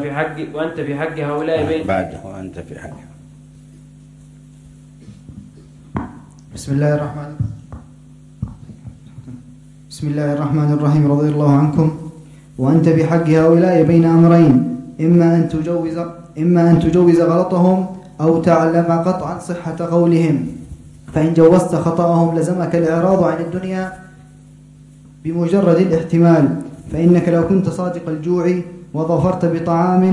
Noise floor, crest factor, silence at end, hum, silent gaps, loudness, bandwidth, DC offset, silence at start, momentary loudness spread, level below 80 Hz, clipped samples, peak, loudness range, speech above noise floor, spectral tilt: -42 dBFS; 16 dB; 0 s; none; none; -15 LUFS; 11.5 kHz; under 0.1%; 0 s; 18 LU; -46 dBFS; under 0.1%; 0 dBFS; 12 LU; 27 dB; -8.5 dB/octave